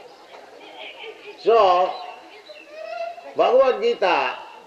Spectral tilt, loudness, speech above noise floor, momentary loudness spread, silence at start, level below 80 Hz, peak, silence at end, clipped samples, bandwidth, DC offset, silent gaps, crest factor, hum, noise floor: -3.5 dB/octave; -20 LUFS; 26 dB; 24 LU; 0.3 s; -66 dBFS; -6 dBFS; 0.05 s; under 0.1%; 8.4 kHz; under 0.1%; none; 16 dB; none; -44 dBFS